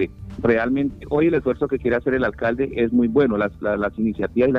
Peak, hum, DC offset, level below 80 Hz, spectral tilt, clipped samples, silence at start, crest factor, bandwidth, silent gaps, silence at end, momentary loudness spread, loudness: -6 dBFS; none; under 0.1%; -42 dBFS; -9 dB/octave; under 0.1%; 0 s; 14 dB; 5.6 kHz; none; 0 s; 5 LU; -21 LUFS